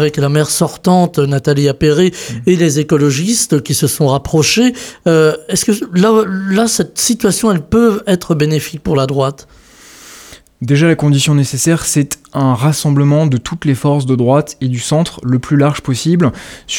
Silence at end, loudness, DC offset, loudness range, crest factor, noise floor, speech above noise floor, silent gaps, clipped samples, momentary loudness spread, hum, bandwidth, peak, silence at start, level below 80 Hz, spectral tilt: 0 s; -13 LUFS; under 0.1%; 3 LU; 12 dB; -39 dBFS; 26 dB; none; under 0.1%; 5 LU; none; 18 kHz; 0 dBFS; 0 s; -42 dBFS; -5 dB/octave